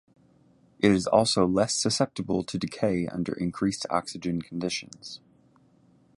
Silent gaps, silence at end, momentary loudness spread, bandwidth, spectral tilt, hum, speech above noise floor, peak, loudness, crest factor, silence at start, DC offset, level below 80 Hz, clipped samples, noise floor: none; 1 s; 11 LU; 11.5 kHz; -4.5 dB/octave; none; 34 dB; -6 dBFS; -27 LUFS; 22 dB; 0.8 s; under 0.1%; -56 dBFS; under 0.1%; -61 dBFS